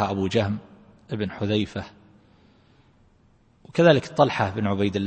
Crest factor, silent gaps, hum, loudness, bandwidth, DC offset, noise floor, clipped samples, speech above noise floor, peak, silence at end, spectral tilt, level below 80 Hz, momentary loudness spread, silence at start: 22 dB; none; none; -23 LUFS; 8.8 kHz; under 0.1%; -59 dBFS; under 0.1%; 36 dB; -4 dBFS; 0 s; -6.5 dB/octave; -56 dBFS; 16 LU; 0 s